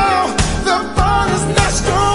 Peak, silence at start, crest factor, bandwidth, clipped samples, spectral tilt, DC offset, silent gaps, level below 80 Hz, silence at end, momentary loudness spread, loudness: 0 dBFS; 0 s; 14 dB; 11.5 kHz; under 0.1%; -4 dB/octave; under 0.1%; none; -24 dBFS; 0 s; 2 LU; -15 LUFS